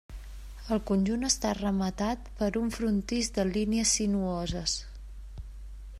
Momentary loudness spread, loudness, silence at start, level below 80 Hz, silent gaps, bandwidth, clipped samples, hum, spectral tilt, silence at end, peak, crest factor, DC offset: 20 LU; -29 LUFS; 0.1 s; -42 dBFS; none; 14.5 kHz; under 0.1%; none; -4 dB/octave; 0 s; -12 dBFS; 18 dB; under 0.1%